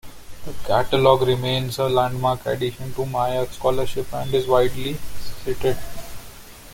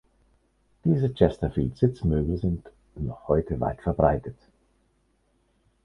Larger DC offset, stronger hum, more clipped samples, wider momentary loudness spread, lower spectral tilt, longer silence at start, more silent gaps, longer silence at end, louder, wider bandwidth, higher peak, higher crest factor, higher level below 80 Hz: neither; neither; neither; first, 20 LU vs 12 LU; second, -5.5 dB/octave vs -10 dB/octave; second, 0.05 s vs 0.85 s; neither; second, 0 s vs 1.5 s; first, -22 LUFS vs -26 LUFS; first, 17 kHz vs 6.6 kHz; about the same, -2 dBFS vs -4 dBFS; second, 18 dB vs 24 dB; about the same, -40 dBFS vs -40 dBFS